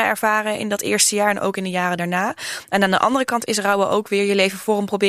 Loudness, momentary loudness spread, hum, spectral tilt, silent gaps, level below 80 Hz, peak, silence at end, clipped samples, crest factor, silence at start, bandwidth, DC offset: -19 LUFS; 6 LU; none; -3 dB/octave; none; -64 dBFS; -2 dBFS; 0 s; under 0.1%; 18 dB; 0 s; 15.5 kHz; under 0.1%